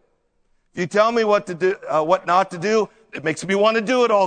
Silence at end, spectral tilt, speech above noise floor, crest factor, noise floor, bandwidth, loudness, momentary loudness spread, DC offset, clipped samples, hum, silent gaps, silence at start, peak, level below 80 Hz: 0 s; -4.5 dB/octave; 46 dB; 18 dB; -64 dBFS; 9.4 kHz; -20 LUFS; 9 LU; under 0.1%; under 0.1%; none; none; 0.75 s; -2 dBFS; -64 dBFS